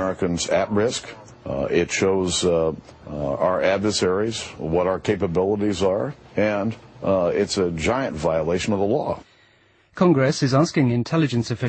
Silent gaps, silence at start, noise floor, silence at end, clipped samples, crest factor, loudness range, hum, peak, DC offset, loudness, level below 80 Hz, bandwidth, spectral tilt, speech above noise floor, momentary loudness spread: none; 0 s; -57 dBFS; 0 s; under 0.1%; 16 dB; 1 LU; none; -6 dBFS; under 0.1%; -22 LUFS; -48 dBFS; 8.8 kHz; -5.5 dB/octave; 36 dB; 10 LU